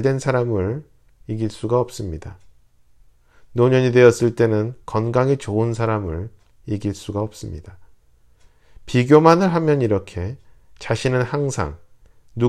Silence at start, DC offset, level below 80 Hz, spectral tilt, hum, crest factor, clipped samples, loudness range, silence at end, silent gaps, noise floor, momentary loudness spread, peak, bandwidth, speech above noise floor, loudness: 0 s; under 0.1%; -46 dBFS; -7 dB/octave; none; 20 dB; under 0.1%; 8 LU; 0 s; none; -54 dBFS; 18 LU; 0 dBFS; 13 kHz; 36 dB; -19 LUFS